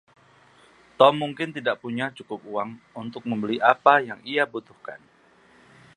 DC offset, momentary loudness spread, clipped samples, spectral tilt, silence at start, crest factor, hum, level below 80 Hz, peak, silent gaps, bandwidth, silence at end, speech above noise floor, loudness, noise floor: under 0.1%; 19 LU; under 0.1%; -6 dB/octave; 1 s; 24 dB; none; -72 dBFS; -2 dBFS; none; 10.5 kHz; 1 s; 33 dB; -23 LUFS; -57 dBFS